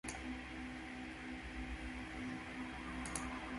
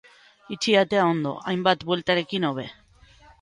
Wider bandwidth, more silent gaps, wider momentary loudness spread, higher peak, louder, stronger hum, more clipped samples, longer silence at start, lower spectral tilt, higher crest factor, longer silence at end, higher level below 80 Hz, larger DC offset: about the same, 11.5 kHz vs 11.5 kHz; neither; second, 4 LU vs 12 LU; second, -24 dBFS vs -6 dBFS; second, -46 LUFS vs -23 LUFS; neither; neither; second, 0.05 s vs 0.5 s; about the same, -4 dB/octave vs -5 dB/octave; about the same, 22 dB vs 20 dB; second, 0 s vs 0.7 s; first, -54 dBFS vs -60 dBFS; neither